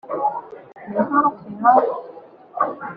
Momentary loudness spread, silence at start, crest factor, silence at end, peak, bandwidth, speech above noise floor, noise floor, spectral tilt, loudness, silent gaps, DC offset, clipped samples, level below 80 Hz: 22 LU; 0.05 s; 20 dB; 0 s; -2 dBFS; 4.9 kHz; 24 dB; -42 dBFS; -6.5 dB/octave; -20 LUFS; none; under 0.1%; under 0.1%; -68 dBFS